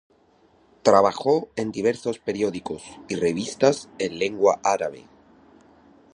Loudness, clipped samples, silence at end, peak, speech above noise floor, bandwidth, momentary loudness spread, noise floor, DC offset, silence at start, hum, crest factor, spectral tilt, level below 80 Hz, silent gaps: -23 LUFS; under 0.1%; 1.15 s; -2 dBFS; 36 dB; 10.5 kHz; 13 LU; -59 dBFS; under 0.1%; 0.85 s; none; 24 dB; -4.5 dB/octave; -60 dBFS; none